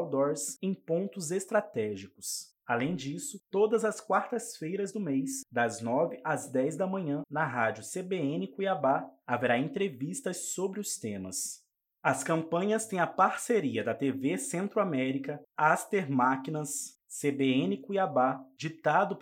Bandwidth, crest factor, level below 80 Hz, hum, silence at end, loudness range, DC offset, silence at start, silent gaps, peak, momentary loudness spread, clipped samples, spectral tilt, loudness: 16.5 kHz; 20 dB; -78 dBFS; none; 0 s; 3 LU; under 0.1%; 0 s; none; -10 dBFS; 8 LU; under 0.1%; -4.5 dB/octave; -31 LUFS